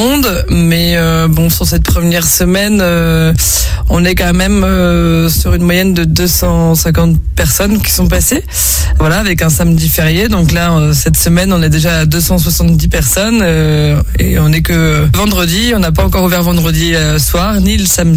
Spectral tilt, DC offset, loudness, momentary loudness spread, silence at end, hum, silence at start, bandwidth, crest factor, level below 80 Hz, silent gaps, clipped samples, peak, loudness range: -4.5 dB/octave; under 0.1%; -10 LUFS; 2 LU; 0 s; none; 0 s; 18.5 kHz; 10 dB; -16 dBFS; none; under 0.1%; 0 dBFS; 1 LU